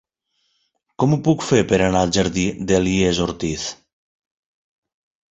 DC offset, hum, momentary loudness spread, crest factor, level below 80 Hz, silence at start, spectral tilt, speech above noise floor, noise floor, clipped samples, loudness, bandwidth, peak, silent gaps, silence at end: under 0.1%; none; 8 LU; 20 dB; -42 dBFS; 1 s; -5 dB/octave; 52 dB; -70 dBFS; under 0.1%; -19 LUFS; 8.2 kHz; -2 dBFS; none; 1.6 s